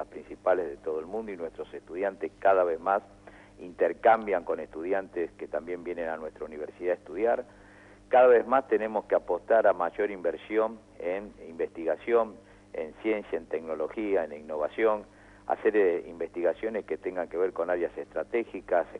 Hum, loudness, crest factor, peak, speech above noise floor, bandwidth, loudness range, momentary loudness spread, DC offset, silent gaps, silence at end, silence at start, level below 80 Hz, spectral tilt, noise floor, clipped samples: 50 Hz at -60 dBFS; -29 LUFS; 18 dB; -10 dBFS; 25 dB; 9.4 kHz; 6 LU; 14 LU; under 0.1%; none; 0 s; 0 s; -62 dBFS; -6.5 dB/octave; -53 dBFS; under 0.1%